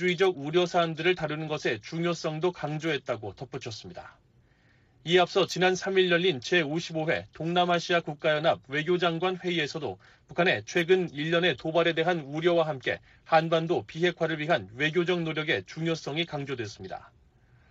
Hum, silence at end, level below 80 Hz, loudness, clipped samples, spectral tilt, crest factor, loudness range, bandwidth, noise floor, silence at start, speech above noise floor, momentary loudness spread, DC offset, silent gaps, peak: none; 0.65 s; -66 dBFS; -27 LUFS; under 0.1%; -3.5 dB/octave; 18 dB; 5 LU; 8 kHz; -63 dBFS; 0 s; 35 dB; 12 LU; under 0.1%; none; -10 dBFS